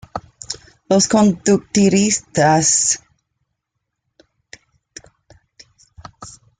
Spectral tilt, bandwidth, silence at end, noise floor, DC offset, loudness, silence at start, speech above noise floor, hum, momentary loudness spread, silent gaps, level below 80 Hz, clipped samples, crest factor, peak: -4 dB/octave; 9.6 kHz; 0.3 s; -77 dBFS; under 0.1%; -15 LUFS; 0.15 s; 62 dB; none; 19 LU; none; -52 dBFS; under 0.1%; 18 dB; -2 dBFS